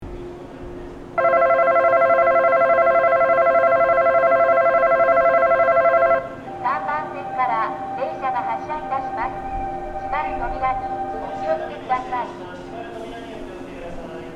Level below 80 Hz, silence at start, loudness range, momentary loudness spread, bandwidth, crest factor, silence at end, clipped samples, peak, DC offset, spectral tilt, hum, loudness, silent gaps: -44 dBFS; 0 s; 10 LU; 18 LU; 7.2 kHz; 14 dB; 0 s; under 0.1%; -6 dBFS; under 0.1%; -6.5 dB/octave; none; -19 LUFS; none